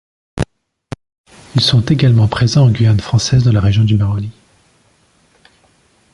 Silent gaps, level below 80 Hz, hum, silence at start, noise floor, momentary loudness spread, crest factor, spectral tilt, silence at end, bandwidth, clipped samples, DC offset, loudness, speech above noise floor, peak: 1.18-1.24 s; -34 dBFS; none; 0.35 s; -54 dBFS; 21 LU; 14 dB; -6 dB/octave; 1.85 s; 11.5 kHz; under 0.1%; under 0.1%; -13 LUFS; 43 dB; 0 dBFS